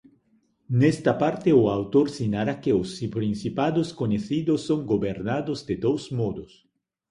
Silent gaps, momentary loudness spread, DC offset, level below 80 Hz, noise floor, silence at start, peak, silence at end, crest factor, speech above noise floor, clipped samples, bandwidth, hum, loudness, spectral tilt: none; 8 LU; under 0.1%; -54 dBFS; -66 dBFS; 0.7 s; -6 dBFS; 0.65 s; 18 dB; 42 dB; under 0.1%; 11 kHz; none; -25 LUFS; -7.5 dB/octave